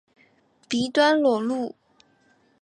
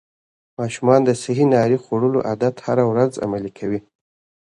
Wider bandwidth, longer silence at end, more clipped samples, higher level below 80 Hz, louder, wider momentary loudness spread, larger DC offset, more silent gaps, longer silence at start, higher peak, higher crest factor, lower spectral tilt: about the same, 10.5 kHz vs 11 kHz; first, 0.95 s vs 0.7 s; neither; second, -68 dBFS vs -58 dBFS; second, -23 LUFS vs -19 LUFS; about the same, 11 LU vs 11 LU; neither; neither; about the same, 0.7 s vs 0.6 s; second, -8 dBFS vs 0 dBFS; about the same, 18 dB vs 18 dB; second, -4 dB/octave vs -7 dB/octave